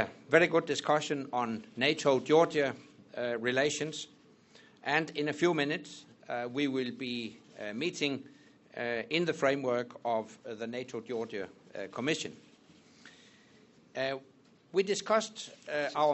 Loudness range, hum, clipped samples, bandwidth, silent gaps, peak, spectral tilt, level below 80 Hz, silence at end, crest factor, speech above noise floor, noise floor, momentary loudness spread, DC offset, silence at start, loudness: 9 LU; none; under 0.1%; 8.2 kHz; none; -8 dBFS; -4 dB/octave; -76 dBFS; 0 s; 26 dB; 29 dB; -61 dBFS; 16 LU; under 0.1%; 0 s; -32 LUFS